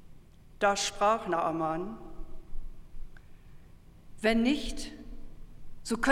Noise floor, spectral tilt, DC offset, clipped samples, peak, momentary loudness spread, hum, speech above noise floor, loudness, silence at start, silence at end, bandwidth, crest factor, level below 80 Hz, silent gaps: -52 dBFS; -3.5 dB/octave; under 0.1%; under 0.1%; -12 dBFS; 23 LU; none; 24 dB; -30 LUFS; 0 s; 0 s; 14.5 kHz; 20 dB; -44 dBFS; none